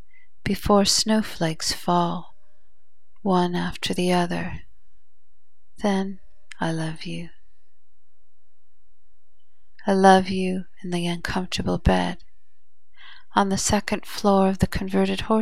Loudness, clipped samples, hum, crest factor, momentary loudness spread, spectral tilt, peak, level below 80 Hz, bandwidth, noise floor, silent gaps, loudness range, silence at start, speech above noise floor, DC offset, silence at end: -23 LUFS; under 0.1%; none; 24 dB; 14 LU; -4.5 dB/octave; -2 dBFS; -42 dBFS; 15.5 kHz; -72 dBFS; none; 8 LU; 0.45 s; 50 dB; 2%; 0 s